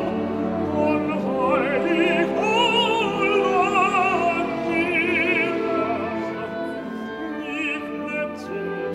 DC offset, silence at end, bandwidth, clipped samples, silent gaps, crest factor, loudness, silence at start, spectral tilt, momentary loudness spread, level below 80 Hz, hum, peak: under 0.1%; 0 s; 13.5 kHz; under 0.1%; none; 14 dB; -22 LUFS; 0 s; -5 dB/octave; 10 LU; -56 dBFS; none; -8 dBFS